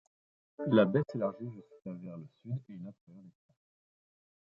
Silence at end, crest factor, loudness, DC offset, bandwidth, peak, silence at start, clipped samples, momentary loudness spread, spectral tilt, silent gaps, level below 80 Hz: 1.15 s; 24 dB; -32 LUFS; under 0.1%; 7 kHz; -12 dBFS; 0.6 s; under 0.1%; 21 LU; -7 dB/octave; 3.01-3.07 s; -76 dBFS